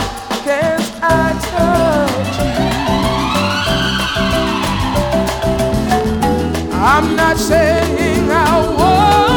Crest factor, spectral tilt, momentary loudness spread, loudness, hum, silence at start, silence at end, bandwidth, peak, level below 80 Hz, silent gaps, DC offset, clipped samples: 12 dB; -5 dB/octave; 5 LU; -14 LUFS; none; 0 s; 0 s; over 20 kHz; -2 dBFS; -26 dBFS; none; under 0.1%; under 0.1%